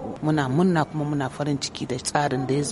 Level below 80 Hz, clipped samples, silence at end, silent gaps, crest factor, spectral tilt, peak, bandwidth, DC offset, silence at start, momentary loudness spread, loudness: -54 dBFS; under 0.1%; 0 s; none; 18 dB; -5.5 dB/octave; -6 dBFS; 11.5 kHz; under 0.1%; 0 s; 6 LU; -24 LUFS